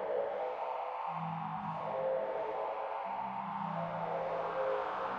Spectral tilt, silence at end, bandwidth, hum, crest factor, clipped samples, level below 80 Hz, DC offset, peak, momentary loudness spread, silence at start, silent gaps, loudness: -7.5 dB/octave; 0 s; 6.8 kHz; none; 12 dB; under 0.1%; -74 dBFS; under 0.1%; -24 dBFS; 4 LU; 0 s; none; -38 LUFS